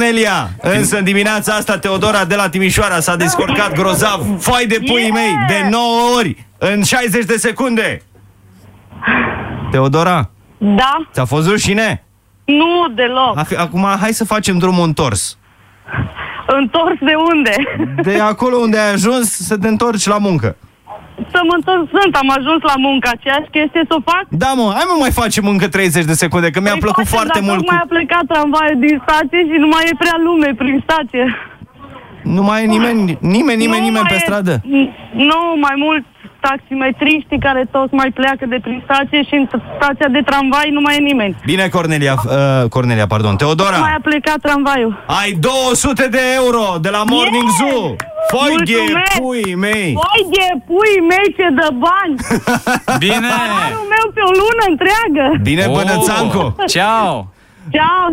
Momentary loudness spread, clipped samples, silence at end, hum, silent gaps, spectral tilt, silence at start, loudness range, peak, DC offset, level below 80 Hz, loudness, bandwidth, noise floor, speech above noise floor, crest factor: 5 LU; under 0.1%; 0 s; none; none; -4.5 dB/octave; 0 s; 3 LU; 0 dBFS; under 0.1%; -38 dBFS; -13 LUFS; 16.5 kHz; -44 dBFS; 31 dB; 12 dB